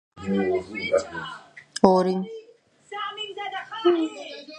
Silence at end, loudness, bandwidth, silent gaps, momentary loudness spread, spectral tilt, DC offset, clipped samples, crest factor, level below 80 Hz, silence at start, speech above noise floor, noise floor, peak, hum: 0 s; -25 LUFS; 11.5 kHz; none; 18 LU; -5.5 dB/octave; under 0.1%; under 0.1%; 26 dB; -60 dBFS; 0.15 s; 23 dB; -47 dBFS; 0 dBFS; none